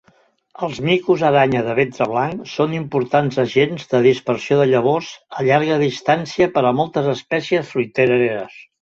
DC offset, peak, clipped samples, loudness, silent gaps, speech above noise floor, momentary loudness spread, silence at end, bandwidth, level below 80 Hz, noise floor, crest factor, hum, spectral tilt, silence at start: under 0.1%; -2 dBFS; under 0.1%; -18 LUFS; none; 40 dB; 7 LU; 0.25 s; 7.6 kHz; -56 dBFS; -57 dBFS; 16 dB; none; -6.5 dB/octave; 0.6 s